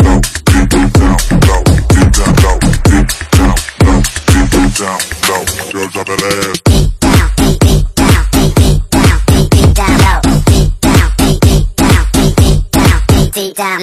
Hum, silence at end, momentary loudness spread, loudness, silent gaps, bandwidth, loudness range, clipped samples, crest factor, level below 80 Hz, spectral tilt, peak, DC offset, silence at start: none; 0 s; 5 LU; -9 LUFS; none; 16 kHz; 3 LU; 0.2%; 8 dB; -12 dBFS; -5 dB/octave; 0 dBFS; 0.7%; 0 s